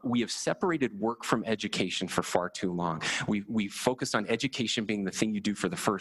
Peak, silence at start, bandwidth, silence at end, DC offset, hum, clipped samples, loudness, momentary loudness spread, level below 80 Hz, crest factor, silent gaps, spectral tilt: -8 dBFS; 0.05 s; 13 kHz; 0 s; under 0.1%; none; under 0.1%; -30 LUFS; 2 LU; -62 dBFS; 22 dB; none; -4 dB/octave